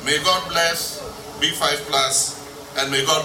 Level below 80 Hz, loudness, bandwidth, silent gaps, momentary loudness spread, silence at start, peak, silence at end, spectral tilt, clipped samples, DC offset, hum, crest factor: -50 dBFS; -20 LUFS; 16.5 kHz; none; 11 LU; 0 s; -4 dBFS; 0 s; -1 dB/octave; under 0.1%; under 0.1%; none; 18 dB